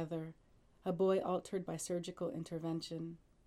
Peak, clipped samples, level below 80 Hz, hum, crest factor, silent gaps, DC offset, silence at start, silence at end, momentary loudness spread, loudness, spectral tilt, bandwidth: -22 dBFS; under 0.1%; -72 dBFS; none; 16 dB; none; under 0.1%; 0 s; 0.3 s; 12 LU; -40 LUFS; -6 dB/octave; 13.5 kHz